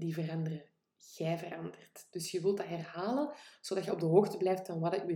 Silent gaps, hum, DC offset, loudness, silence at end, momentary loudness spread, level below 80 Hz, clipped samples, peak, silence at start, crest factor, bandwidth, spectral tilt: none; none; under 0.1%; -35 LUFS; 0 s; 18 LU; -84 dBFS; under 0.1%; -12 dBFS; 0 s; 22 dB; 17.5 kHz; -6.5 dB/octave